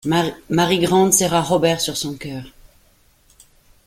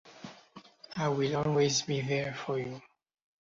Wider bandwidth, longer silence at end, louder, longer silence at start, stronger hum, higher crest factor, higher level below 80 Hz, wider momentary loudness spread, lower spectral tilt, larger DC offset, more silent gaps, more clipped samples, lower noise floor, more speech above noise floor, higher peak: first, 16.5 kHz vs 7.8 kHz; first, 1.35 s vs 0.6 s; first, -17 LUFS vs -31 LUFS; about the same, 0.05 s vs 0.05 s; neither; about the same, 20 dB vs 18 dB; first, -50 dBFS vs -66 dBFS; second, 15 LU vs 21 LU; about the same, -4 dB/octave vs -4.5 dB/octave; neither; neither; neither; about the same, -56 dBFS vs -55 dBFS; first, 37 dB vs 25 dB; first, 0 dBFS vs -16 dBFS